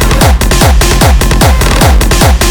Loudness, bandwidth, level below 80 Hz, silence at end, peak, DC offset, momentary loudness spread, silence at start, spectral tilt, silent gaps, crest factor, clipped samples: -7 LUFS; over 20 kHz; -8 dBFS; 0 s; 0 dBFS; under 0.1%; 1 LU; 0 s; -4.5 dB/octave; none; 6 dB; 0.6%